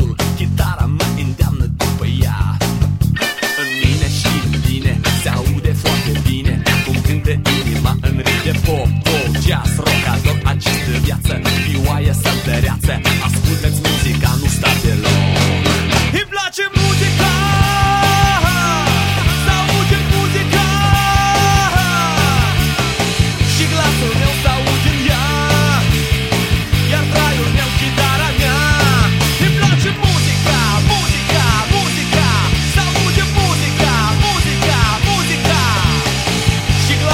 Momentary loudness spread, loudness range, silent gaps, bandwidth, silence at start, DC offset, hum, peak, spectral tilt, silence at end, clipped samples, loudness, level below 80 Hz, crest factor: 4 LU; 3 LU; none; 16.5 kHz; 0 s; under 0.1%; none; 0 dBFS; -4.5 dB/octave; 0 s; under 0.1%; -14 LUFS; -24 dBFS; 14 dB